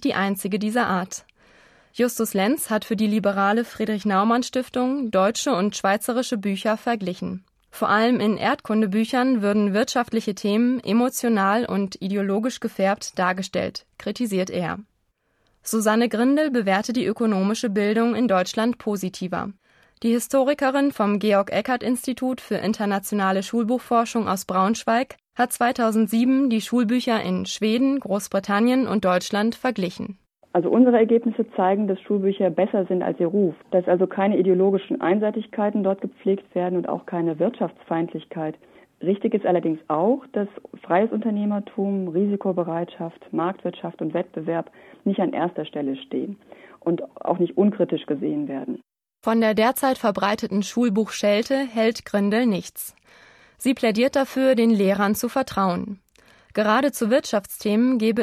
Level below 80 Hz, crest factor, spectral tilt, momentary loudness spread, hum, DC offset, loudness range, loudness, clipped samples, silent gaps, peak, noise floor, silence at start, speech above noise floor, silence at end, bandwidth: -64 dBFS; 16 dB; -5.5 dB/octave; 9 LU; none; under 0.1%; 4 LU; -22 LUFS; under 0.1%; none; -6 dBFS; -69 dBFS; 0 s; 48 dB; 0 s; 15 kHz